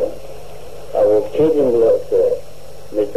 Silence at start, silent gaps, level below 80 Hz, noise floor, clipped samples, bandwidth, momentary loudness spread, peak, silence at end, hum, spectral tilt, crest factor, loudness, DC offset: 0 s; none; -46 dBFS; -39 dBFS; under 0.1%; 14 kHz; 22 LU; -4 dBFS; 0 s; none; -7 dB/octave; 12 dB; -16 LUFS; 4%